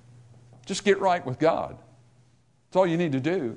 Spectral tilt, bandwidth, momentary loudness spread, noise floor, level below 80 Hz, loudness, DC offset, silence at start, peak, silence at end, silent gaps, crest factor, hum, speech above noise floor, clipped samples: -5.5 dB/octave; 11 kHz; 8 LU; -63 dBFS; -64 dBFS; -25 LUFS; under 0.1%; 0.65 s; -8 dBFS; 0 s; none; 18 dB; none; 38 dB; under 0.1%